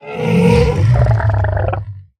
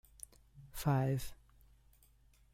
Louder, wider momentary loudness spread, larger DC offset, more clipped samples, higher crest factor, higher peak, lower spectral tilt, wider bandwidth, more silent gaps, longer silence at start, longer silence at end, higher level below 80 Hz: first, -14 LUFS vs -36 LUFS; second, 8 LU vs 20 LU; neither; neither; second, 14 dB vs 20 dB; first, 0 dBFS vs -20 dBFS; first, -8 dB/octave vs -6.5 dB/octave; second, 10 kHz vs 16.5 kHz; neither; second, 0.05 s vs 0.55 s; second, 0.15 s vs 1.2 s; first, -24 dBFS vs -58 dBFS